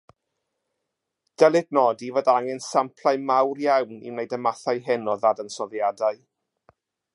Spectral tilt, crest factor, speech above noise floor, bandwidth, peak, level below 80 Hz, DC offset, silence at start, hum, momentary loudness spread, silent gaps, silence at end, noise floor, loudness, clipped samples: -4.5 dB/octave; 20 dB; 59 dB; 11.5 kHz; -4 dBFS; -80 dBFS; under 0.1%; 1.4 s; none; 10 LU; none; 1 s; -82 dBFS; -23 LUFS; under 0.1%